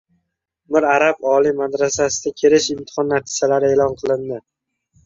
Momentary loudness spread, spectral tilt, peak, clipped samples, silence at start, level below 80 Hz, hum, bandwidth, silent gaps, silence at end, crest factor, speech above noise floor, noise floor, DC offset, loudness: 8 LU; -3.5 dB/octave; -2 dBFS; under 0.1%; 0.7 s; -54 dBFS; none; 7.8 kHz; none; 0.65 s; 18 dB; 55 dB; -73 dBFS; under 0.1%; -17 LUFS